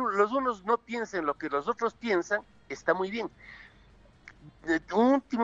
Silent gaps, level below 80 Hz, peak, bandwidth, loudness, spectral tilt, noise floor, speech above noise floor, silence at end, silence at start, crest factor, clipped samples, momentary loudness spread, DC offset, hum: none; -62 dBFS; -10 dBFS; 7.8 kHz; -29 LUFS; -5 dB/octave; -57 dBFS; 28 dB; 0 s; 0 s; 20 dB; under 0.1%; 16 LU; under 0.1%; none